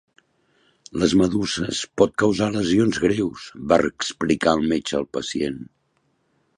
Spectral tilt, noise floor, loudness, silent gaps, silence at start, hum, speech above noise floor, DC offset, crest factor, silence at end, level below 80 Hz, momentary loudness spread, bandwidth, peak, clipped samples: -5 dB/octave; -68 dBFS; -21 LUFS; none; 0.95 s; none; 47 dB; under 0.1%; 20 dB; 0.95 s; -48 dBFS; 9 LU; 11.5 kHz; -2 dBFS; under 0.1%